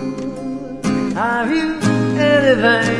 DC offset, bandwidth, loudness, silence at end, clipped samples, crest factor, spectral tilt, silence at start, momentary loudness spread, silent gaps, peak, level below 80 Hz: under 0.1%; 11 kHz; -17 LUFS; 0 s; under 0.1%; 16 dB; -5.5 dB/octave; 0 s; 13 LU; none; 0 dBFS; -44 dBFS